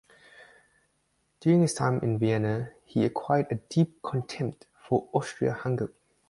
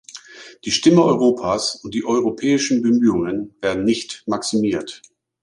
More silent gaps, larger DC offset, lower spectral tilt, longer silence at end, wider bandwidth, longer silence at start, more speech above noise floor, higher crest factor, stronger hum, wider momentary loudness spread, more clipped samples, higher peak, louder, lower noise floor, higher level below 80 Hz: neither; neither; first, -7 dB/octave vs -4.5 dB/octave; about the same, 0.4 s vs 0.45 s; about the same, 11.5 kHz vs 11.5 kHz; first, 0.4 s vs 0.15 s; first, 46 dB vs 22 dB; about the same, 18 dB vs 18 dB; neither; about the same, 10 LU vs 12 LU; neither; second, -10 dBFS vs -2 dBFS; second, -28 LUFS vs -19 LUFS; first, -73 dBFS vs -40 dBFS; second, -62 dBFS vs -54 dBFS